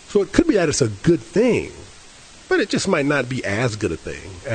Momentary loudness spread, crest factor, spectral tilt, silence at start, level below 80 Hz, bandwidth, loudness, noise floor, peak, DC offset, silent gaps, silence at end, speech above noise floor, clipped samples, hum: 13 LU; 20 dB; -5 dB/octave; 0.1 s; -44 dBFS; 9.4 kHz; -20 LUFS; -44 dBFS; 0 dBFS; under 0.1%; none; 0 s; 24 dB; under 0.1%; none